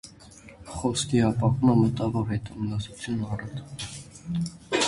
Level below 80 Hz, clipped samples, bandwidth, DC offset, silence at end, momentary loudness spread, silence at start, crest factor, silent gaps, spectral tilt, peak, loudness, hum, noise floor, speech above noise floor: -48 dBFS; under 0.1%; 11.5 kHz; under 0.1%; 0 s; 16 LU; 0.05 s; 20 dB; none; -5.5 dB/octave; -8 dBFS; -27 LUFS; none; -49 dBFS; 23 dB